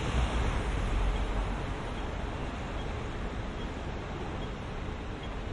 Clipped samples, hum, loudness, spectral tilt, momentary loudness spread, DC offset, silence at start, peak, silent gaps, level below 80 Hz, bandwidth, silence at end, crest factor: under 0.1%; none; -36 LUFS; -6 dB/octave; 7 LU; under 0.1%; 0 s; -16 dBFS; none; -36 dBFS; 11 kHz; 0 s; 18 dB